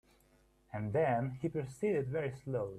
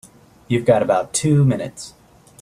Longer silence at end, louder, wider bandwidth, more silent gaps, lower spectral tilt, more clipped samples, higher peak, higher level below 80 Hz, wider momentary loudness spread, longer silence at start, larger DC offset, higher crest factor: second, 0 s vs 0.55 s; second, -36 LUFS vs -18 LUFS; about the same, 12.5 kHz vs 13.5 kHz; neither; first, -8 dB/octave vs -6 dB/octave; neither; second, -22 dBFS vs -2 dBFS; second, -66 dBFS vs -52 dBFS; second, 7 LU vs 17 LU; first, 0.75 s vs 0.5 s; neither; about the same, 16 dB vs 18 dB